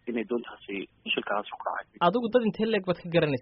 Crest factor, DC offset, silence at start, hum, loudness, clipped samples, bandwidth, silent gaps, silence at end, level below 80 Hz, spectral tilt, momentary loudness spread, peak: 18 dB; under 0.1%; 0.05 s; none; -29 LUFS; under 0.1%; 5.8 kHz; none; 0 s; -64 dBFS; -4 dB/octave; 11 LU; -10 dBFS